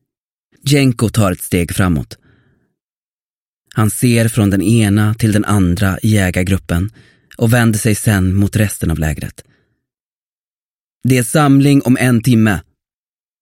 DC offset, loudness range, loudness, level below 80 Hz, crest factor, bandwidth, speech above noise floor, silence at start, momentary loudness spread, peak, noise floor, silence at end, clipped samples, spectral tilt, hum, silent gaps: under 0.1%; 4 LU; -14 LUFS; -36 dBFS; 14 dB; 16.5 kHz; over 77 dB; 0.65 s; 9 LU; 0 dBFS; under -90 dBFS; 0.8 s; under 0.1%; -6 dB/octave; none; 2.83-3.65 s, 10.00-10.99 s